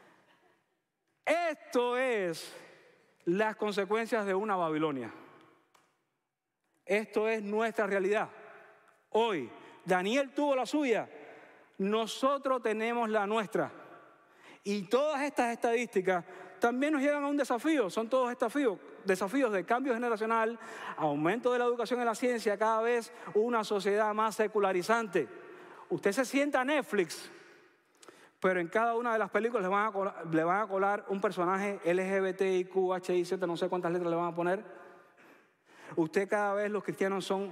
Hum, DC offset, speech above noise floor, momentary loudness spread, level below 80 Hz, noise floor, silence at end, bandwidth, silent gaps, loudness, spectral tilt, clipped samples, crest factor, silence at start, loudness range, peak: none; under 0.1%; 55 dB; 7 LU; -84 dBFS; -86 dBFS; 0 s; 16 kHz; none; -31 LUFS; -5 dB/octave; under 0.1%; 16 dB; 1.25 s; 4 LU; -16 dBFS